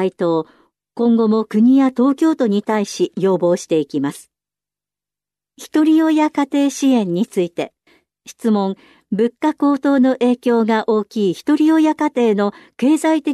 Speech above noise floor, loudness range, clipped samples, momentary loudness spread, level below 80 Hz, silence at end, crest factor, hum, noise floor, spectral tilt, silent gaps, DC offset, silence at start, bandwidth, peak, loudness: 73 dB; 4 LU; under 0.1%; 9 LU; -70 dBFS; 0 s; 12 dB; 50 Hz at -50 dBFS; -89 dBFS; -6 dB/octave; none; under 0.1%; 0 s; 13 kHz; -6 dBFS; -17 LUFS